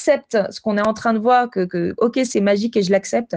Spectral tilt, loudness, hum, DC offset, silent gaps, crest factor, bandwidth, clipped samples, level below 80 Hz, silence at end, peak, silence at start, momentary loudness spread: -5.5 dB/octave; -18 LUFS; none; under 0.1%; none; 14 dB; 9.8 kHz; under 0.1%; -60 dBFS; 0 s; -4 dBFS; 0 s; 6 LU